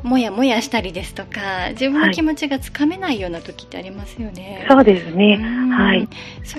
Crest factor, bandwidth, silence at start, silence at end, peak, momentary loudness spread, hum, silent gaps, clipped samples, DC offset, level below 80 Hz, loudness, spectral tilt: 18 dB; 13.5 kHz; 0 s; 0 s; 0 dBFS; 17 LU; 60 Hz at -45 dBFS; none; under 0.1%; under 0.1%; -40 dBFS; -17 LUFS; -5.5 dB/octave